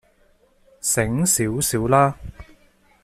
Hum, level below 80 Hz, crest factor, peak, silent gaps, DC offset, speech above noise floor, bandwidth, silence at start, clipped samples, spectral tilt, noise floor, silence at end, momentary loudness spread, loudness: none; -44 dBFS; 20 dB; -2 dBFS; none; under 0.1%; 39 dB; 15.5 kHz; 0.85 s; under 0.1%; -4.5 dB/octave; -59 dBFS; 0.6 s; 12 LU; -20 LUFS